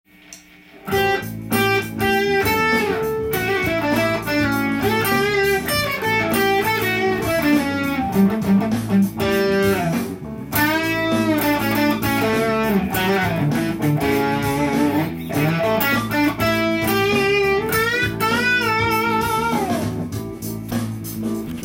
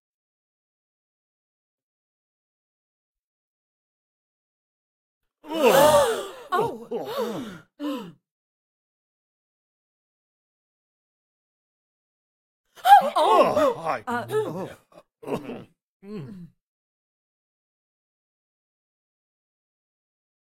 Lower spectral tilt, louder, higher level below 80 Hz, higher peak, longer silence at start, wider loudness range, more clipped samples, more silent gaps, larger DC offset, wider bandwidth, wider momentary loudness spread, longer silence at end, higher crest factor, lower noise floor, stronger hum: about the same, -5 dB/octave vs -4 dB/octave; first, -19 LUFS vs -22 LUFS; first, -44 dBFS vs -68 dBFS; about the same, -4 dBFS vs -2 dBFS; second, 0.3 s vs 5.45 s; second, 2 LU vs 18 LU; neither; second, none vs 8.31-12.64 s, 15.82-16.00 s; neither; about the same, 17 kHz vs 16.5 kHz; second, 6 LU vs 23 LU; second, 0 s vs 4.05 s; second, 16 dB vs 26 dB; second, -45 dBFS vs under -90 dBFS; neither